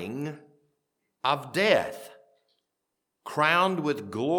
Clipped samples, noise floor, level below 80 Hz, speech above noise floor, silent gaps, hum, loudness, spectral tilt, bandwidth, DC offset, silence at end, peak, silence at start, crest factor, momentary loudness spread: under 0.1%; -83 dBFS; -74 dBFS; 57 dB; none; none; -26 LUFS; -5 dB/octave; 19 kHz; under 0.1%; 0 s; -6 dBFS; 0 s; 22 dB; 15 LU